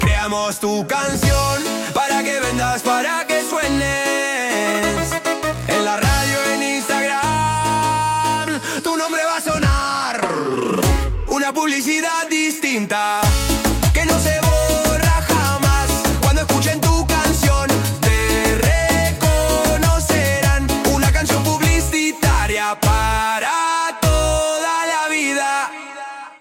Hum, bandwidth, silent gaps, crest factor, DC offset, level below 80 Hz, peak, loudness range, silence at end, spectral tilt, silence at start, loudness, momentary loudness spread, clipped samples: none; 17 kHz; none; 14 dB; under 0.1%; -26 dBFS; -2 dBFS; 2 LU; 0.05 s; -4 dB/octave; 0 s; -17 LUFS; 4 LU; under 0.1%